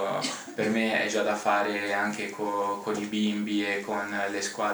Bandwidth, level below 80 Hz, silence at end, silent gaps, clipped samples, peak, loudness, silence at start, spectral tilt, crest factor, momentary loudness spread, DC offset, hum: over 20 kHz; -72 dBFS; 0 s; none; under 0.1%; -10 dBFS; -28 LUFS; 0 s; -3.5 dB/octave; 18 dB; 5 LU; under 0.1%; none